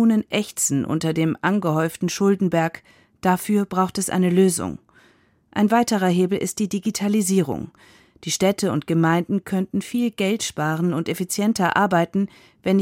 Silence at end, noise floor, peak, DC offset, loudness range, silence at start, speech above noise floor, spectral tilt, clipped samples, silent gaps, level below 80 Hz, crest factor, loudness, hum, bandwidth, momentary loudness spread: 0 s; -58 dBFS; -6 dBFS; under 0.1%; 1 LU; 0 s; 37 dB; -5 dB/octave; under 0.1%; none; -58 dBFS; 16 dB; -21 LUFS; none; 16.5 kHz; 8 LU